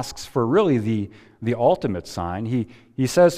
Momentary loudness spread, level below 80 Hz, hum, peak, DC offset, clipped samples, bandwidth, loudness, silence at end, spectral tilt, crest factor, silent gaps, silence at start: 10 LU; -50 dBFS; none; -6 dBFS; under 0.1%; under 0.1%; 15.5 kHz; -22 LUFS; 0 s; -6.5 dB/octave; 16 dB; none; 0 s